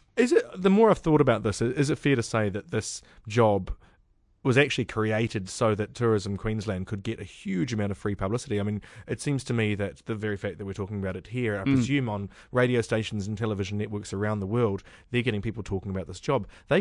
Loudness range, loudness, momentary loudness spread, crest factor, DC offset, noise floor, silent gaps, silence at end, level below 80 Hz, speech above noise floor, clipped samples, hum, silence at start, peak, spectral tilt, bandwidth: 6 LU; -27 LUFS; 10 LU; 20 dB; under 0.1%; -64 dBFS; none; 0 s; -50 dBFS; 37 dB; under 0.1%; none; 0.15 s; -6 dBFS; -6 dB/octave; 11 kHz